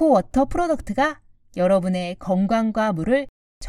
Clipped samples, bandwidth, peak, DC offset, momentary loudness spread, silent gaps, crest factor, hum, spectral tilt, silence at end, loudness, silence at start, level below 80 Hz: under 0.1%; 12 kHz; -6 dBFS; under 0.1%; 7 LU; 3.29-3.61 s; 14 dB; none; -7 dB/octave; 0 s; -22 LUFS; 0 s; -42 dBFS